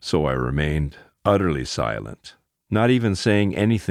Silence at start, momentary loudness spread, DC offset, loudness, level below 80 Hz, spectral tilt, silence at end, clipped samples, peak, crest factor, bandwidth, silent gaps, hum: 0.05 s; 10 LU; under 0.1%; -22 LUFS; -38 dBFS; -6.5 dB/octave; 0 s; under 0.1%; -4 dBFS; 18 dB; 13 kHz; none; none